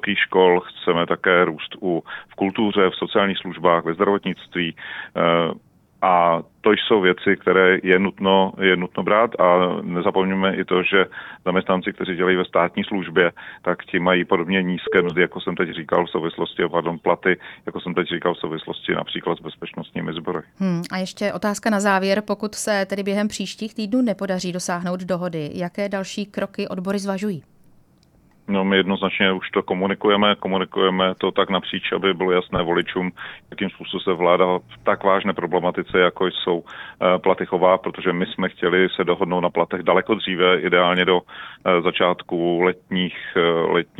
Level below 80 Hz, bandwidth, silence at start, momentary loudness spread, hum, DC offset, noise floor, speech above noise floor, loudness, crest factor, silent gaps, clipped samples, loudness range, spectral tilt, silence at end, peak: -56 dBFS; 13.5 kHz; 0.05 s; 10 LU; none; under 0.1%; -56 dBFS; 35 dB; -20 LUFS; 18 dB; none; under 0.1%; 7 LU; -5.5 dB/octave; 0.15 s; -2 dBFS